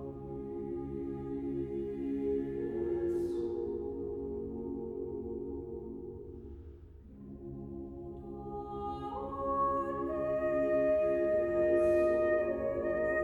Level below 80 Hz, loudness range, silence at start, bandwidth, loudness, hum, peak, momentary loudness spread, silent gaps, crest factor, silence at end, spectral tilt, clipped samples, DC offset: -54 dBFS; 14 LU; 0 s; 6.8 kHz; -34 LUFS; none; -18 dBFS; 16 LU; none; 16 dB; 0 s; -9 dB/octave; under 0.1%; under 0.1%